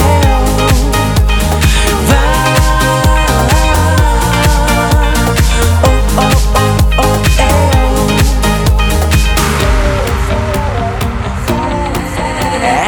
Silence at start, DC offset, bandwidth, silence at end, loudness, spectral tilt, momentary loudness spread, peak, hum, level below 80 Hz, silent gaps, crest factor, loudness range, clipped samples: 0 s; under 0.1%; 19 kHz; 0 s; -11 LUFS; -5 dB/octave; 5 LU; 0 dBFS; none; -14 dBFS; none; 10 dB; 3 LU; under 0.1%